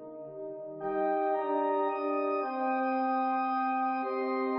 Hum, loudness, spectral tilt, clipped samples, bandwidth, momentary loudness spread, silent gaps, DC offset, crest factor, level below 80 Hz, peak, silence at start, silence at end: none; -31 LUFS; -3.5 dB/octave; under 0.1%; 5.2 kHz; 11 LU; none; under 0.1%; 12 dB; -78 dBFS; -18 dBFS; 0 s; 0 s